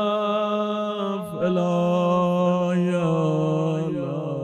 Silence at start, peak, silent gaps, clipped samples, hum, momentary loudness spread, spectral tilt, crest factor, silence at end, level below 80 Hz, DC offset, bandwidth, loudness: 0 s; -10 dBFS; none; under 0.1%; none; 6 LU; -8 dB/octave; 12 dB; 0 s; -68 dBFS; under 0.1%; 11 kHz; -23 LUFS